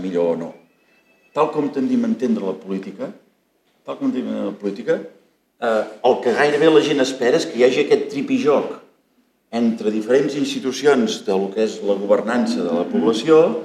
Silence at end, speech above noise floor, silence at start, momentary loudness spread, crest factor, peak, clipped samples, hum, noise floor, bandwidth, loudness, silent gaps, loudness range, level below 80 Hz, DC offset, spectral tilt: 0 s; 45 dB; 0 s; 12 LU; 18 dB; -2 dBFS; under 0.1%; none; -63 dBFS; 12.5 kHz; -19 LUFS; none; 7 LU; -76 dBFS; under 0.1%; -5 dB/octave